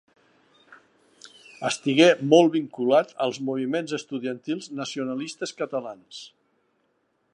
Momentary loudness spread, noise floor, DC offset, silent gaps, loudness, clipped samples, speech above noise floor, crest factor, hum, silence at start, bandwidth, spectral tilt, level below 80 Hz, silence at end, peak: 15 LU; -71 dBFS; under 0.1%; none; -24 LUFS; under 0.1%; 47 dB; 22 dB; none; 0.7 s; 10.5 kHz; -4.5 dB/octave; -80 dBFS; 1.05 s; -2 dBFS